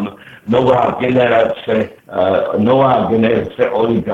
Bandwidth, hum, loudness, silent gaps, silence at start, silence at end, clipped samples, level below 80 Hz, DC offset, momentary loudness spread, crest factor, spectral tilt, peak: 7.6 kHz; none; -14 LUFS; none; 0 s; 0 s; under 0.1%; -48 dBFS; under 0.1%; 6 LU; 14 dB; -8 dB/octave; 0 dBFS